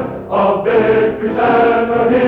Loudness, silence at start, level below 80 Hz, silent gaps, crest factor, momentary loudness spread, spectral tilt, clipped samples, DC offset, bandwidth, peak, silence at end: -13 LUFS; 0 s; -42 dBFS; none; 12 dB; 4 LU; -8.5 dB/octave; under 0.1%; under 0.1%; 4.8 kHz; 0 dBFS; 0 s